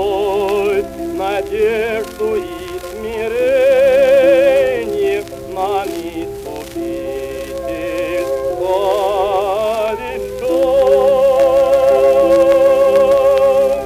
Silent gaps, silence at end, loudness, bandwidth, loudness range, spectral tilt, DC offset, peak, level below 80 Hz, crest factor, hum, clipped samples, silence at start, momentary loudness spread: none; 0 s; -14 LUFS; 15.5 kHz; 10 LU; -5 dB/octave; under 0.1%; -2 dBFS; -40 dBFS; 12 dB; none; under 0.1%; 0 s; 14 LU